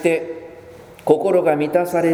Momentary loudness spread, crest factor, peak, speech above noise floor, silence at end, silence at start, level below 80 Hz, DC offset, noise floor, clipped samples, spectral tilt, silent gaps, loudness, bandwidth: 18 LU; 18 dB; 0 dBFS; 24 dB; 0 s; 0 s; -58 dBFS; under 0.1%; -41 dBFS; under 0.1%; -6.5 dB/octave; none; -18 LUFS; 19.5 kHz